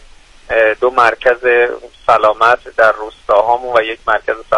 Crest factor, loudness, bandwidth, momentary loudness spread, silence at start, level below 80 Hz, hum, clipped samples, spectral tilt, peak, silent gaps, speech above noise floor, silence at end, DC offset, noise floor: 14 dB; -13 LUFS; 11 kHz; 6 LU; 0.5 s; -42 dBFS; none; under 0.1%; -4 dB/octave; 0 dBFS; none; 26 dB; 0 s; under 0.1%; -39 dBFS